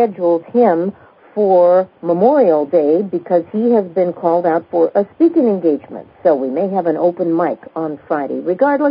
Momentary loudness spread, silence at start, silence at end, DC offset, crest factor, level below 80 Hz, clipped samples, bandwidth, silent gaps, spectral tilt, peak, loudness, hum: 9 LU; 0 s; 0 s; under 0.1%; 14 dB; -66 dBFS; under 0.1%; 5.2 kHz; none; -13 dB/octave; 0 dBFS; -15 LUFS; none